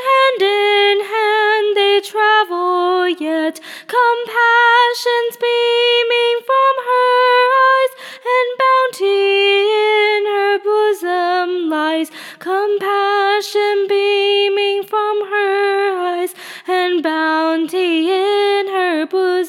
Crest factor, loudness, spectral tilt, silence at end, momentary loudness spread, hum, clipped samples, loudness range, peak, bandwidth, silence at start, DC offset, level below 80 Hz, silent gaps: 14 dB; -15 LUFS; -1.5 dB/octave; 0 s; 6 LU; none; under 0.1%; 3 LU; -2 dBFS; 16 kHz; 0 s; under 0.1%; -86 dBFS; none